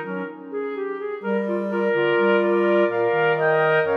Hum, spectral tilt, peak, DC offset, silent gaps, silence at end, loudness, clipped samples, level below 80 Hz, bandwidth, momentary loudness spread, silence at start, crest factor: none; -8 dB/octave; -6 dBFS; under 0.1%; none; 0 s; -21 LUFS; under 0.1%; -80 dBFS; 5.4 kHz; 11 LU; 0 s; 14 dB